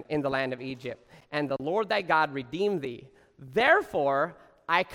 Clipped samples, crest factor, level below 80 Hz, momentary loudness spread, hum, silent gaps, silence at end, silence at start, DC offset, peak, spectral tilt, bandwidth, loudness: under 0.1%; 20 dB; -64 dBFS; 16 LU; none; none; 0 s; 0 s; under 0.1%; -8 dBFS; -6 dB/octave; 16 kHz; -28 LUFS